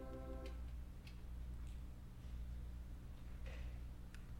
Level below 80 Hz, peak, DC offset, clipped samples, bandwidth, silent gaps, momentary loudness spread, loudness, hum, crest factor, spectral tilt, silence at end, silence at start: -50 dBFS; -38 dBFS; under 0.1%; under 0.1%; 16.5 kHz; none; 5 LU; -53 LUFS; 60 Hz at -55 dBFS; 12 dB; -7 dB/octave; 0 s; 0 s